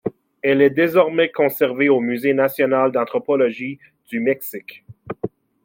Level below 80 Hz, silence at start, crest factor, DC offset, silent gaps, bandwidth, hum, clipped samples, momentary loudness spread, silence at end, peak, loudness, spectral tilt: -66 dBFS; 0.05 s; 18 dB; under 0.1%; none; 17 kHz; none; under 0.1%; 15 LU; 0.35 s; -2 dBFS; -18 LUFS; -6 dB/octave